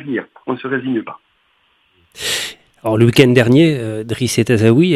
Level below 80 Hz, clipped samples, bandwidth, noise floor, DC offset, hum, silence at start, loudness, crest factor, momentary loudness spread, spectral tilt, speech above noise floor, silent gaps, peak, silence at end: -52 dBFS; under 0.1%; 15 kHz; -59 dBFS; under 0.1%; none; 0 s; -15 LUFS; 16 dB; 14 LU; -5.5 dB/octave; 45 dB; none; 0 dBFS; 0 s